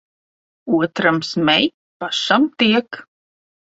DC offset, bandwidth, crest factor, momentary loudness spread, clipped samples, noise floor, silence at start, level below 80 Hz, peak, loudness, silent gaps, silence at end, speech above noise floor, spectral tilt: under 0.1%; 8 kHz; 20 dB; 17 LU; under 0.1%; under -90 dBFS; 0.65 s; -62 dBFS; 0 dBFS; -17 LUFS; 1.74-2.00 s; 0.6 s; over 73 dB; -4.5 dB/octave